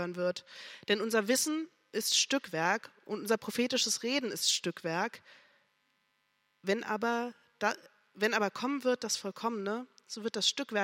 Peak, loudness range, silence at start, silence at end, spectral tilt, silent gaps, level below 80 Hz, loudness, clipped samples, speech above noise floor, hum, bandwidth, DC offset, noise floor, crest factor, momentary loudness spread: -14 dBFS; 5 LU; 0 s; 0 s; -2 dB/octave; none; -86 dBFS; -32 LUFS; under 0.1%; 43 dB; none; 16.5 kHz; under 0.1%; -76 dBFS; 20 dB; 11 LU